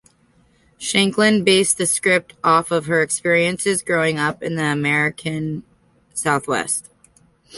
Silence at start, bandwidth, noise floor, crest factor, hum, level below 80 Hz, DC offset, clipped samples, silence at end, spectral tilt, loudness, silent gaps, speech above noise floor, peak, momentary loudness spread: 0.8 s; 12 kHz; -57 dBFS; 18 dB; none; -58 dBFS; under 0.1%; under 0.1%; 0 s; -3.5 dB/octave; -18 LUFS; none; 39 dB; -2 dBFS; 10 LU